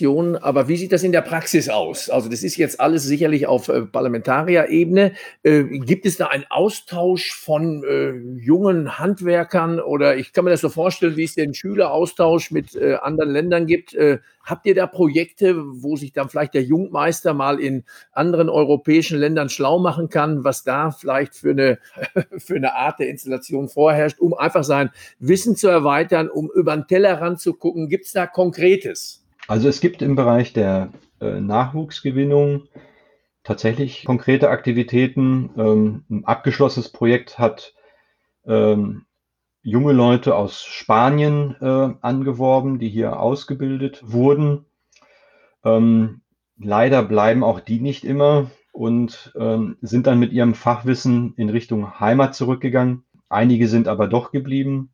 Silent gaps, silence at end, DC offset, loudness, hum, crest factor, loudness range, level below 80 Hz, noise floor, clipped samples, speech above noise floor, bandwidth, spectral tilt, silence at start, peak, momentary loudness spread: none; 0.1 s; under 0.1%; -18 LUFS; none; 18 dB; 3 LU; -60 dBFS; -78 dBFS; under 0.1%; 60 dB; over 20 kHz; -6.5 dB/octave; 0 s; -2 dBFS; 9 LU